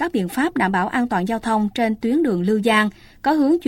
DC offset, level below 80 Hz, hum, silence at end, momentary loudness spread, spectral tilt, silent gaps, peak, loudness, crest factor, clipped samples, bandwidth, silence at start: under 0.1%; -50 dBFS; none; 0 s; 5 LU; -6 dB/octave; none; -2 dBFS; -20 LUFS; 16 dB; under 0.1%; 16.5 kHz; 0 s